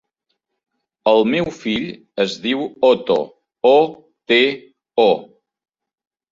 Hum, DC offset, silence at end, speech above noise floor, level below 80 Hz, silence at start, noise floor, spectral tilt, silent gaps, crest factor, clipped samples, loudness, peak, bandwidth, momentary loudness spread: none; under 0.1%; 1.05 s; 58 dB; -58 dBFS; 1.05 s; -74 dBFS; -5 dB/octave; none; 18 dB; under 0.1%; -17 LUFS; -2 dBFS; 7.6 kHz; 9 LU